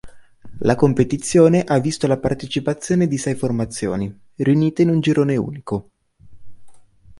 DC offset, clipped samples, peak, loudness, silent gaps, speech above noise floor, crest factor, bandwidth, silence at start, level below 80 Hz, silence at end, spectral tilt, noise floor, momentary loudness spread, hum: under 0.1%; under 0.1%; -2 dBFS; -19 LUFS; none; 25 dB; 16 dB; 11.5 kHz; 0.05 s; -46 dBFS; 0 s; -6.5 dB/octave; -43 dBFS; 10 LU; none